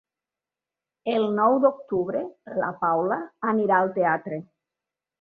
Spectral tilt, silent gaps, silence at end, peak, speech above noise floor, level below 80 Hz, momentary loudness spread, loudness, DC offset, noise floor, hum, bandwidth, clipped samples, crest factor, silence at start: -9 dB/octave; none; 0.75 s; -6 dBFS; 66 dB; -70 dBFS; 11 LU; -24 LUFS; under 0.1%; -90 dBFS; none; 4.9 kHz; under 0.1%; 18 dB; 1.05 s